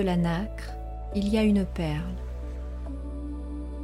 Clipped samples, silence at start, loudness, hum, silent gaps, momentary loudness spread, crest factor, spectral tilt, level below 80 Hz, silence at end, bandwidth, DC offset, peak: under 0.1%; 0 s; -30 LUFS; none; none; 13 LU; 16 dB; -7.5 dB/octave; -36 dBFS; 0 s; 12.5 kHz; under 0.1%; -14 dBFS